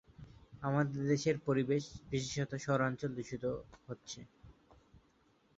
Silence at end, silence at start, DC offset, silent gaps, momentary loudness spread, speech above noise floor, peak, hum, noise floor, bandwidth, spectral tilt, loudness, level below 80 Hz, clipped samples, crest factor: 1.05 s; 0.2 s; under 0.1%; none; 16 LU; 35 dB; -20 dBFS; none; -71 dBFS; 8 kHz; -6 dB/octave; -36 LUFS; -64 dBFS; under 0.1%; 18 dB